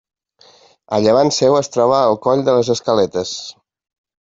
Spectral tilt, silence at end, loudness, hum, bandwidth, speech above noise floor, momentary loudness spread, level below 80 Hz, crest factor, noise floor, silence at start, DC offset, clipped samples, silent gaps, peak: -5 dB/octave; 0.7 s; -15 LUFS; none; 7.8 kHz; 35 dB; 10 LU; -56 dBFS; 14 dB; -50 dBFS; 0.9 s; under 0.1%; under 0.1%; none; -2 dBFS